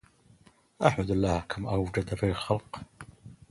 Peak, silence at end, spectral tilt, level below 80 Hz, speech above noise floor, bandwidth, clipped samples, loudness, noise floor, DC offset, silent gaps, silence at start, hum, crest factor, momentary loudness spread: -6 dBFS; 0.15 s; -6.5 dB/octave; -46 dBFS; 32 dB; 11.5 kHz; under 0.1%; -29 LUFS; -60 dBFS; under 0.1%; none; 0.8 s; none; 26 dB; 20 LU